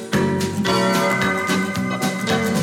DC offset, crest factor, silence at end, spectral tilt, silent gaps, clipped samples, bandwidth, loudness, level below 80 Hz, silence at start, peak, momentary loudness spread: under 0.1%; 12 dB; 0 s; -4.5 dB/octave; none; under 0.1%; 17 kHz; -20 LUFS; -52 dBFS; 0 s; -6 dBFS; 4 LU